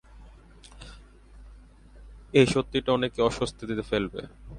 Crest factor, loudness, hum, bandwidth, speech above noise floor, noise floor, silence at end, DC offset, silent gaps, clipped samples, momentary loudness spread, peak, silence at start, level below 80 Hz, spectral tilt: 24 dB; -26 LUFS; none; 11.5 kHz; 24 dB; -50 dBFS; 0 s; under 0.1%; none; under 0.1%; 25 LU; -6 dBFS; 0.15 s; -48 dBFS; -5.5 dB/octave